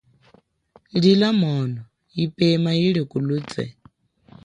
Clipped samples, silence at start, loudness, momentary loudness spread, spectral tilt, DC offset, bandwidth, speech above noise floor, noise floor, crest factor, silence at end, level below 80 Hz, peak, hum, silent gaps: under 0.1%; 0.95 s; -21 LUFS; 14 LU; -7.5 dB/octave; under 0.1%; 10 kHz; 38 dB; -57 dBFS; 18 dB; 0.75 s; -60 dBFS; -4 dBFS; none; none